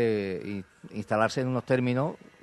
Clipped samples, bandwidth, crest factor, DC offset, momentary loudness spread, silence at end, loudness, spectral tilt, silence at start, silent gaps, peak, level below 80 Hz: under 0.1%; 12 kHz; 18 dB; under 0.1%; 13 LU; 0.25 s; -29 LUFS; -7 dB/octave; 0 s; none; -10 dBFS; -66 dBFS